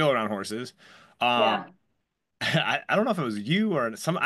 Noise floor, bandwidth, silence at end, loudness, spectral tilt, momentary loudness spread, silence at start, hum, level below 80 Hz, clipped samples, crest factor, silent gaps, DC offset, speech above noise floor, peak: -78 dBFS; 12.5 kHz; 0 s; -26 LUFS; -5 dB/octave; 9 LU; 0 s; none; -72 dBFS; under 0.1%; 18 dB; none; under 0.1%; 52 dB; -10 dBFS